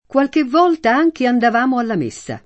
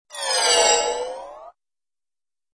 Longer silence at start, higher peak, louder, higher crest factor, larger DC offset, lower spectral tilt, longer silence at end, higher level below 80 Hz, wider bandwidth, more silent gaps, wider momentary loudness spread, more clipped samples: about the same, 0.15 s vs 0.1 s; about the same, -2 dBFS vs -4 dBFS; about the same, -16 LUFS vs -18 LUFS; second, 14 dB vs 20 dB; neither; first, -5.5 dB/octave vs 2 dB/octave; second, 0.05 s vs 1.05 s; about the same, -58 dBFS vs -58 dBFS; second, 8.6 kHz vs 11 kHz; neither; second, 7 LU vs 20 LU; neither